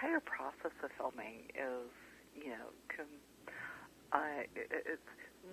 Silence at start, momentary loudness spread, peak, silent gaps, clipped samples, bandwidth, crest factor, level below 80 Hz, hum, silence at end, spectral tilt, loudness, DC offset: 0 s; 16 LU; -14 dBFS; none; under 0.1%; 16 kHz; 30 dB; -76 dBFS; none; 0 s; -4.5 dB/octave; -44 LUFS; under 0.1%